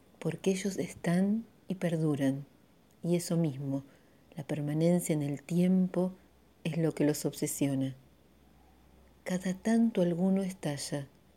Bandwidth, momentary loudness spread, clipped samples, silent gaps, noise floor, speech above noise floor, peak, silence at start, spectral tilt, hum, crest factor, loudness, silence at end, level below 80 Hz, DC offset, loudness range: 16.5 kHz; 10 LU; under 0.1%; none; -63 dBFS; 32 dB; -16 dBFS; 0.2 s; -6.5 dB/octave; none; 16 dB; -32 LUFS; 0.3 s; -68 dBFS; under 0.1%; 3 LU